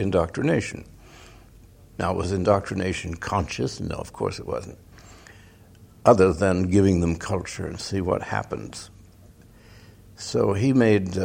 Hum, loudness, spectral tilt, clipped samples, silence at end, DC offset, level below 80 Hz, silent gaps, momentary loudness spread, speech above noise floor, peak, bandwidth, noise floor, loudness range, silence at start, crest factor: none; -24 LUFS; -6.5 dB/octave; under 0.1%; 0 s; under 0.1%; -46 dBFS; none; 15 LU; 27 dB; -2 dBFS; 16 kHz; -50 dBFS; 7 LU; 0 s; 22 dB